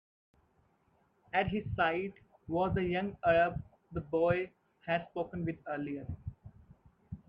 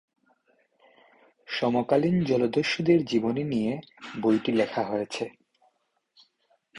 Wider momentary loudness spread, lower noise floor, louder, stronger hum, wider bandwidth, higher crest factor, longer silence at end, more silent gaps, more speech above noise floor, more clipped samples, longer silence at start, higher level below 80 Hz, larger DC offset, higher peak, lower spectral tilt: first, 15 LU vs 11 LU; about the same, -72 dBFS vs -72 dBFS; second, -34 LUFS vs -26 LUFS; neither; second, 5.4 kHz vs 11 kHz; about the same, 20 dB vs 18 dB; about the same, 0.1 s vs 0 s; neither; second, 39 dB vs 47 dB; neither; second, 1.35 s vs 1.5 s; first, -56 dBFS vs -64 dBFS; neither; second, -16 dBFS vs -10 dBFS; first, -9 dB/octave vs -6.5 dB/octave